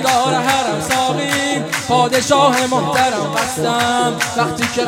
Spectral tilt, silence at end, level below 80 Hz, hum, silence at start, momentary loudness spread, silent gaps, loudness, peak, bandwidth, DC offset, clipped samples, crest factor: -3.5 dB/octave; 0 s; -50 dBFS; none; 0 s; 5 LU; none; -15 LUFS; 0 dBFS; 16.5 kHz; under 0.1%; under 0.1%; 16 dB